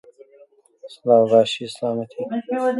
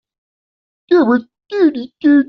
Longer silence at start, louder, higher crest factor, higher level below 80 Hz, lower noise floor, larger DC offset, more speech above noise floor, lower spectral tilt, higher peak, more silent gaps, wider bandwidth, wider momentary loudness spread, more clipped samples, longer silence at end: about the same, 0.85 s vs 0.9 s; second, -20 LUFS vs -15 LUFS; about the same, 18 dB vs 14 dB; second, -72 dBFS vs -60 dBFS; second, -53 dBFS vs under -90 dBFS; neither; second, 33 dB vs over 77 dB; first, -5.5 dB/octave vs -4 dB/octave; about the same, -2 dBFS vs -2 dBFS; neither; first, 11.5 kHz vs 6 kHz; first, 13 LU vs 6 LU; neither; about the same, 0 s vs 0.05 s